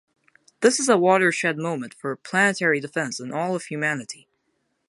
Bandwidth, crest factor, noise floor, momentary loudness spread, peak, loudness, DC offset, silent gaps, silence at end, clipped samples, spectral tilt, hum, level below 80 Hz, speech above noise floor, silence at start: 11.5 kHz; 20 dB; -72 dBFS; 13 LU; -4 dBFS; -22 LUFS; under 0.1%; none; 0.75 s; under 0.1%; -4 dB/octave; none; -76 dBFS; 50 dB; 0.6 s